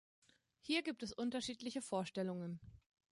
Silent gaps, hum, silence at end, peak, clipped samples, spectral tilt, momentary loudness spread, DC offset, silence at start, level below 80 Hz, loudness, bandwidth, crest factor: none; none; 0.3 s; -24 dBFS; under 0.1%; -4.5 dB/octave; 10 LU; under 0.1%; 0.65 s; -74 dBFS; -43 LUFS; 11.5 kHz; 20 dB